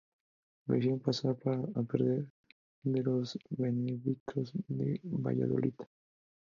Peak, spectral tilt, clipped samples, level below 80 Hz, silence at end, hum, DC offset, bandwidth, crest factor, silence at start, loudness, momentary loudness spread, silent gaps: -14 dBFS; -8.5 dB/octave; under 0.1%; -72 dBFS; 0.7 s; none; under 0.1%; 7.4 kHz; 20 dB; 0.65 s; -34 LUFS; 7 LU; 2.30-2.44 s, 2.52-2.82 s, 4.20-4.26 s